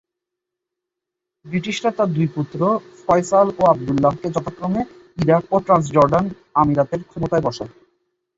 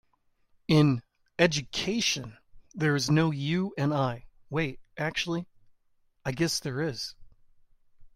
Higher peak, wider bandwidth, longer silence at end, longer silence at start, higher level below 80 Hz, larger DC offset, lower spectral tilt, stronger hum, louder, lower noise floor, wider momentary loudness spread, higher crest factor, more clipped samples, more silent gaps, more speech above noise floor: first, -2 dBFS vs -8 dBFS; second, 8 kHz vs 15.5 kHz; first, 0.7 s vs 0.1 s; first, 1.45 s vs 0.7 s; first, -50 dBFS vs -58 dBFS; neither; first, -7 dB/octave vs -5 dB/octave; neither; first, -19 LUFS vs -28 LUFS; first, -83 dBFS vs -69 dBFS; second, 10 LU vs 14 LU; about the same, 18 dB vs 20 dB; neither; neither; first, 65 dB vs 42 dB